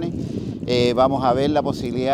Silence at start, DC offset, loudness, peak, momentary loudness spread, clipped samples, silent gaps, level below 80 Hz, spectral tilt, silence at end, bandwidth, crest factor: 0 s; under 0.1%; -20 LUFS; -4 dBFS; 10 LU; under 0.1%; none; -44 dBFS; -6.5 dB/octave; 0 s; 14 kHz; 16 dB